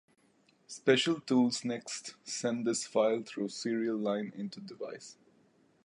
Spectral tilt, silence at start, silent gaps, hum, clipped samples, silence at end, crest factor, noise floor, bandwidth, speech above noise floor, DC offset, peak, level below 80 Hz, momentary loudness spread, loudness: -4 dB/octave; 0.7 s; none; none; under 0.1%; 0.75 s; 22 dB; -69 dBFS; 11 kHz; 36 dB; under 0.1%; -12 dBFS; -82 dBFS; 15 LU; -33 LUFS